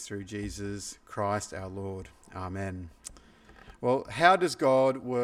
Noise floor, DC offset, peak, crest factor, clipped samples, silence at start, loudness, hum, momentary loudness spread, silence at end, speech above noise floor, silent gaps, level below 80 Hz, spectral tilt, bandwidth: -54 dBFS; under 0.1%; -6 dBFS; 24 dB; under 0.1%; 0 s; -29 LUFS; none; 20 LU; 0 s; 24 dB; none; -56 dBFS; -5 dB/octave; 15 kHz